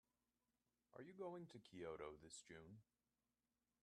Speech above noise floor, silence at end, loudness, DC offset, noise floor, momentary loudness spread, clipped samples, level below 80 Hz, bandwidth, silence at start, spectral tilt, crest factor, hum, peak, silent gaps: over 33 dB; 1 s; -58 LUFS; under 0.1%; under -90 dBFS; 12 LU; under 0.1%; -84 dBFS; 11.5 kHz; 0.95 s; -5 dB/octave; 20 dB; 60 Hz at -85 dBFS; -40 dBFS; none